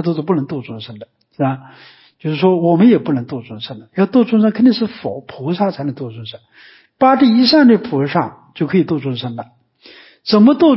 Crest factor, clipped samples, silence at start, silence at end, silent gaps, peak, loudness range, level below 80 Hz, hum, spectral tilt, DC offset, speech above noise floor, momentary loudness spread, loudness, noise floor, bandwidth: 14 dB; under 0.1%; 0 s; 0 s; none; -2 dBFS; 3 LU; -60 dBFS; none; -11 dB/octave; under 0.1%; 29 dB; 18 LU; -15 LUFS; -44 dBFS; 5.8 kHz